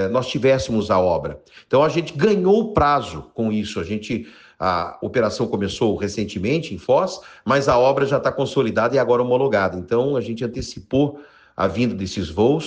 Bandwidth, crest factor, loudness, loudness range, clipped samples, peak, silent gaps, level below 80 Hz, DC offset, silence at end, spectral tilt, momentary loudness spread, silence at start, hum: 9.6 kHz; 16 dB; -20 LUFS; 4 LU; under 0.1%; -4 dBFS; none; -46 dBFS; under 0.1%; 0 s; -6 dB/octave; 9 LU; 0 s; none